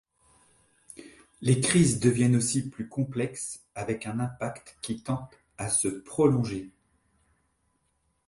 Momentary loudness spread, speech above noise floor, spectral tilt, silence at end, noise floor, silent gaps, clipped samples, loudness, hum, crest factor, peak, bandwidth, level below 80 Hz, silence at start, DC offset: 16 LU; 47 dB; -5 dB/octave; 1.6 s; -74 dBFS; none; under 0.1%; -27 LUFS; none; 24 dB; -6 dBFS; 11.5 kHz; -58 dBFS; 1 s; under 0.1%